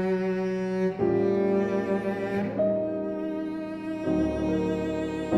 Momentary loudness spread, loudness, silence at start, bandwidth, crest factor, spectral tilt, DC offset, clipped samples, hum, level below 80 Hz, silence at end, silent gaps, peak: 7 LU; -27 LUFS; 0 s; 10 kHz; 16 dB; -8 dB/octave; under 0.1%; under 0.1%; none; -50 dBFS; 0 s; none; -12 dBFS